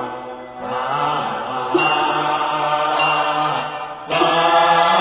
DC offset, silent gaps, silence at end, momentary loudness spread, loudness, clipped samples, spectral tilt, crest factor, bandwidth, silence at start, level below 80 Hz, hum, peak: under 0.1%; none; 0 s; 14 LU; -18 LUFS; under 0.1%; -8 dB/octave; 16 dB; 4 kHz; 0 s; -58 dBFS; none; -2 dBFS